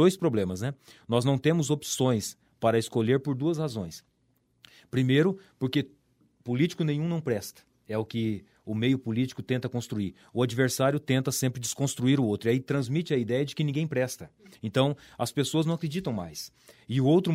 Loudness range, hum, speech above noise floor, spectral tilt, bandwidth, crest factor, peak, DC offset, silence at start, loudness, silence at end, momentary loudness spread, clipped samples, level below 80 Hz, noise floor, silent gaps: 3 LU; none; 43 dB; -6 dB/octave; 16 kHz; 20 dB; -8 dBFS; under 0.1%; 0 s; -28 LUFS; 0 s; 10 LU; under 0.1%; -64 dBFS; -70 dBFS; none